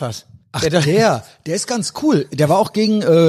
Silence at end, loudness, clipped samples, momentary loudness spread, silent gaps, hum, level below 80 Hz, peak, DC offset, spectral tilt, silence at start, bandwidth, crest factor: 0 s; -17 LUFS; under 0.1%; 11 LU; none; none; -50 dBFS; -2 dBFS; under 0.1%; -5.5 dB/octave; 0 s; 15 kHz; 14 dB